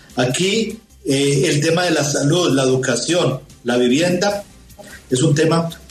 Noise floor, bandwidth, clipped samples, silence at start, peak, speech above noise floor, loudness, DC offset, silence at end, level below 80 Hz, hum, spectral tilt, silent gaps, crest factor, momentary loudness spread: -39 dBFS; 13.5 kHz; under 0.1%; 0.1 s; -4 dBFS; 23 dB; -17 LUFS; under 0.1%; 0.15 s; -50 dBFS; none; -4.5 dB/octave; none; 14 dB; 6 LU